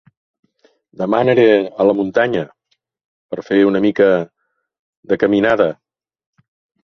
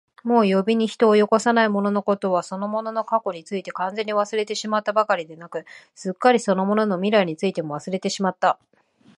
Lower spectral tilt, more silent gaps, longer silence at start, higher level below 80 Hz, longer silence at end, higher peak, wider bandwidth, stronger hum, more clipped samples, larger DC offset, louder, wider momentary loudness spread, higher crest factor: first, -7.5 dB/octave vs -5.5 dB/octave; first, 3.04-3.29 s, 4.79-5.03 s vs none; first, 1 s vs 0.25 s; first, -56 dBFS vs -74 dBFS; first, 1.1 s vs 0.65 s; about the same, -2 dBFS vs -2 dBFS; second, 6.6 kHz vs 11 kHz; neither; neither; neither; first, -15 LUFS vs -21 LUFS; first, 17 LU vs 12 LU; about the same, 16 dB vs 18 dB